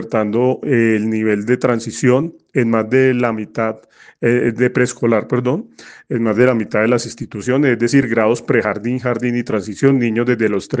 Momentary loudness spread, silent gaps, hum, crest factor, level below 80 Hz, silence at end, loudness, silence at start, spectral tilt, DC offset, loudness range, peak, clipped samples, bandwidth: 7 LU; none; none; 16 dB; -58 dBFS; 0 s; -16 LUFS; 0 s; -6.5 dB/octave; under 0.1%; 1 LU; 0 dBFS; under 0.1%; 9.6 kHz